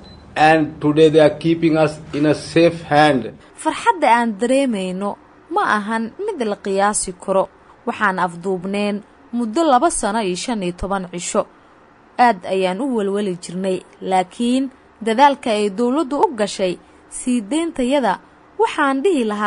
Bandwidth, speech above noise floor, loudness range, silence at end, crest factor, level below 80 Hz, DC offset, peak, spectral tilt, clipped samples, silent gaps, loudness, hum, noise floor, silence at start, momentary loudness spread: 11 kHz; 31 dB; 5 LU; 0 s; 18 dB; -48 dBFS; under 0.1%; 0 dBFS; -4.5 dB/octave; under 0.1%; none; -18 LUFS; none; -48 dBFS; 0 s; 12 LU